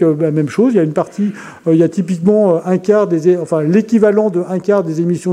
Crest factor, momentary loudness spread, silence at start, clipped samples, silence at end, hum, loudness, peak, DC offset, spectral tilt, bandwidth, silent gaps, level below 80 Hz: 12 dB; 6 LU; 0 s; under 0.1%; 0 s; none; -14 LUFS; 0 dBFS; under 0.1%; -8.5 dB/octave; 11 kHz; none; -60 dBFS